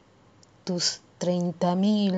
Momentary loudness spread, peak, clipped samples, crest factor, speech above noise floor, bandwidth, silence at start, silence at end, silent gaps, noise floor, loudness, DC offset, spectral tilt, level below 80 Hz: 9 LU; -12 dBFS; under 0.1%; 16 dB; 32 dB; 9 kHz; 0.65 s; 0 s; none; -57 dBFS; -26 LUFS; under 0.1%; -5 dB/octave; -70 dBFS